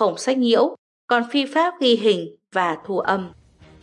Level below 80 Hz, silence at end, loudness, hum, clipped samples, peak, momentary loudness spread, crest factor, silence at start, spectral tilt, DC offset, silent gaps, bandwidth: -64 dBFS; 0.5 s; -20 LUFS; none; under 0.1%; -4 dBFS; 7 LU; 16 dB; 0 s; -4.5 dB/octave; under 0.1%; 0.78-1.08 s; 11 kHz